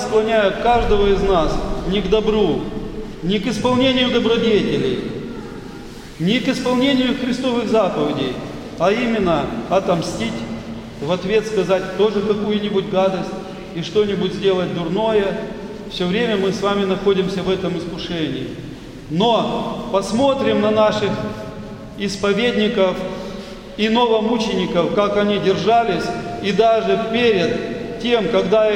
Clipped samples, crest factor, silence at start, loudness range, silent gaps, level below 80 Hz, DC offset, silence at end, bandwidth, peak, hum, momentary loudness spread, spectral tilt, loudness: under 0.1%; 16 dB; 0 s; 3 LU; none; -36 dBFS; under 0.1%; 0 s; 12 kHz; -2 dBFS; none; 13 LU; -5.5 dB/octave; -18 LUFS